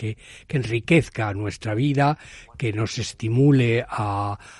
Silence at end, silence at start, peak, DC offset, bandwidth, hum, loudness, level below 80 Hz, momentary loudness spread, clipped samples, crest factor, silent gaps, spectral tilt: 0.05 s; 0 s; -6 dBFS; under 0.1%; 11.5 kHz; none; -23 LUFS; -50 dBFS; 11 LU; under 0.1%; 18 dB; none; -6.5 dB/octave